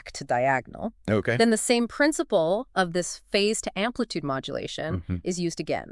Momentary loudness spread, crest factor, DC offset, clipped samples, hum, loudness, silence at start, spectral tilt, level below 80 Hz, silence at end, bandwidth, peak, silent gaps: 9 LU; 20 dB; under 0.1%; under 0.1%; none; -26 LUFS; 0.05 s; -4 dB/octave; -54 dBFS; 0 s; 12 kHz; -6 dBFS; none